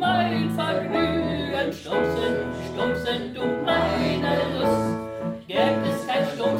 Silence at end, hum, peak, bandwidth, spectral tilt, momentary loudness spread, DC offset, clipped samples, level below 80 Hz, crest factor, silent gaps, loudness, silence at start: 0 s; none; -6 dBFS; 16 kHz; -6 dB/octave; 5 LU; under 0.1%; under 0.1%; -48 dBFS; 18 dB; none; -24 LUFS; 0 s